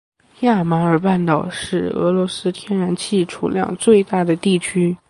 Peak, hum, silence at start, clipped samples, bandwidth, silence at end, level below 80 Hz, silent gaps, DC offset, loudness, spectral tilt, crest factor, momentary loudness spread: -2 dBFS; none; 0.4 s; under 0.1%; 11.5 kHz; 0.15 s; -54 dBFS; none; under 0.1%; -18 LUFS; -6 dB/octave; 16 dB; 7 LU